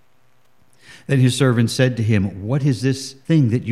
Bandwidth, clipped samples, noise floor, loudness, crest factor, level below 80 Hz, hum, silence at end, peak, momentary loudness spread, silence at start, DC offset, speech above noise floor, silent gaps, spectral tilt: 13 kHz; under 0.1%; -61 dBFS; -18 LUFS; 16 dB; -58 dBFS; none; 0 s; -2 dBFS; 6 LU; 0.9 s; 0.3%; 44 dB; none; -6.5 dB/octave